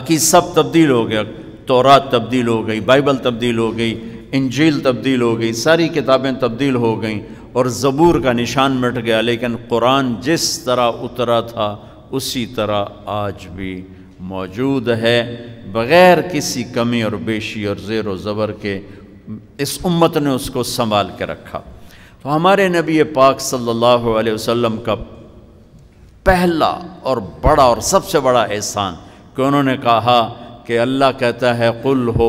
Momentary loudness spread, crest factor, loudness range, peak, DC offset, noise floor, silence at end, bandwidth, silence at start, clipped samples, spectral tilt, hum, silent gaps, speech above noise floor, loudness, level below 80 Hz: 13 LU; 16 dB; 5 LU; 0 dBFS; under 0.1%; -43 dBFS; 0 s; 16 kHz; 0 s; under 0.1%; -4.5 dB/octave; none; none; 28 dB; -16 LUFS; -38 dBFS